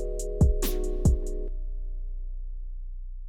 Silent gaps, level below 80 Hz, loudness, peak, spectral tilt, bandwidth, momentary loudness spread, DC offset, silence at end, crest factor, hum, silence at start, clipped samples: none; -28 dBFS; -29 LUFS; -12 dBFS; -6.5 dB/octave; 19 kHz; 17 LU; under 0.1%; 0 s; 16 dB; none; 0 s; under 0.1%